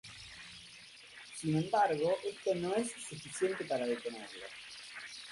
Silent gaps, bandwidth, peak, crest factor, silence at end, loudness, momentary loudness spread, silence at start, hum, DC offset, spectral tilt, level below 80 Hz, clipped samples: none; 11.5 kHz; -20 dBFS; 18 dB; 0 s; -36 LUFS; 18 LU; 0.05 s; none; under 0.1%; -4.5 dB/octave; -72 dBFS; under 0.1%